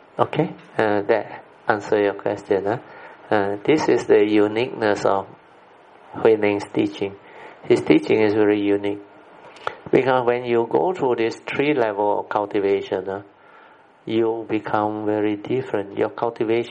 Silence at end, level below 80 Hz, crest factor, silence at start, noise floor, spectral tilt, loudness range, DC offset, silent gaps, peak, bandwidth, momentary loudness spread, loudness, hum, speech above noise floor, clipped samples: 0 s; -64 dBFS; 20 dB; 0.15 s; -50 dBFS; -6.5 dB/octave; 4 LU; under 0.1%; none; 0 dBFS; 9.8 kHz; 13 LU; -21 LUFS; none; 29 dB; under 0.1%